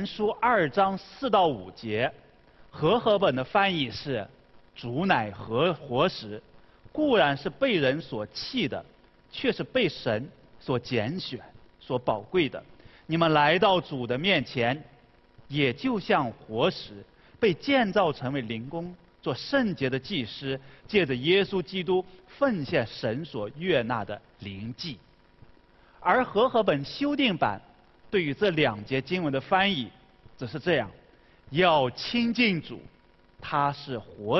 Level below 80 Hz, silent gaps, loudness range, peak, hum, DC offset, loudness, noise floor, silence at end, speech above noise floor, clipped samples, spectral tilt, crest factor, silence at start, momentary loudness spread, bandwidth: -58 dBFS; none; 4 LU; -6 dBFS; none; under 0.1%; -27 LUFS; -57 dBFS; 0 s; 30 dB; under 0.1%; -7 dB/octave; 22 dB; 0 s; 15 LU; 6.2 kHz